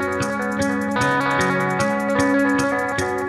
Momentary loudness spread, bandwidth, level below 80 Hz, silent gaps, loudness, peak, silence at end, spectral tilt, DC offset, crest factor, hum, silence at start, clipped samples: 4 LU; 14 kHz; -48 dBFS; none; -20 LUFS; -6 dBFS; 0 s; -5 dB/octave; under 0.1%; 14 dB; none; 0 s; under 0.1%